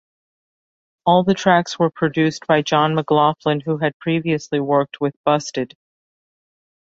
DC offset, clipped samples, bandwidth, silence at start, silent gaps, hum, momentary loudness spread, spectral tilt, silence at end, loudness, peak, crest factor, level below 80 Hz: under 0.1%; under 0.1%; 8 kHz; 1.05 s; 3.94-4.00 s, 5.16-5.24 s; none; 6 LU; -6 dB/octave; 1.2 s; -19 LUFS; -2 dBFS; 18 dB; -60 dBFS